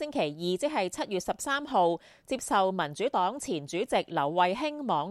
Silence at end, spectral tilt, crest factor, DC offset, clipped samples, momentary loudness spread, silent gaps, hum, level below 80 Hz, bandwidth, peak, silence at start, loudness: 0 s; -4 dB/octave; 18 dB; under 0.1%; under 0.1%; 6 LU; none; none; -64 dBFS; 14.5 kHz; -10 dBFS; 0 s; -29 LUFS